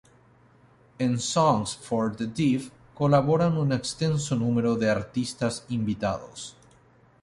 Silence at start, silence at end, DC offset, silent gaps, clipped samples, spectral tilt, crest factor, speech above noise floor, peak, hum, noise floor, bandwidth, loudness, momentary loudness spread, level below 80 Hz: 1 s; 0.7 s; under 0.1%; none; under 0.1%; -6 dB/octave; 18 dB; 33 dB; -8 dBFS; none; -58 dBFS; 11.5 kHz; -26 LUFS; 8 LU; -56 dBFS